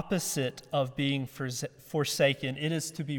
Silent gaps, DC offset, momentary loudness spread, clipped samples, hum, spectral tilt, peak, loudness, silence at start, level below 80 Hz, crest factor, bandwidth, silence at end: none; under 0.1%; 9 LU; under 0.1%; none; -4.5 dB/octave; -14 dBFS; -31 LUFS; 0 s; -66 dBFS; 18 dB; 17.5 kHz; 0 s